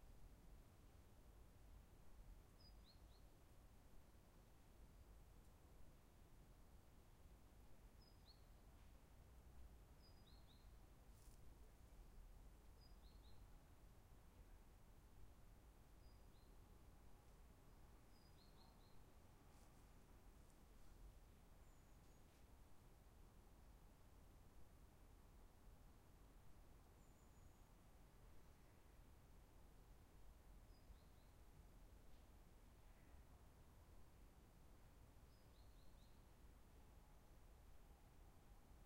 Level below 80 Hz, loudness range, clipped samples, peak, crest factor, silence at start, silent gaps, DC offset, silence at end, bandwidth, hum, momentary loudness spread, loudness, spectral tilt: -68 dBFS; 1 LU; under 0.1%; -50 dBFS; 14 dB; 0 s; none; under 0.1%; 0 s; 16 kHz; none; 2 LU; -69 LUFS; -5 dB/octave